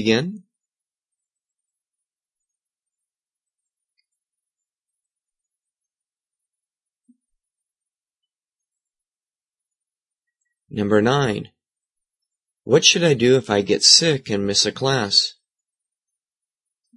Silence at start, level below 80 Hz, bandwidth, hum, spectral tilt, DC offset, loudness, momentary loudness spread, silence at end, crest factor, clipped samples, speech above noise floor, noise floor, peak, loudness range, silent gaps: 0 s; -64 dBFS; 11.5 kHz; none; -3 dB/octave; under 0.1%; -17 LUFS; 14 LU; 1.65 s; 24 dB; under 0.1%; over 72 dB; under -90 dBFS; 0 dBFS; 9 LU; none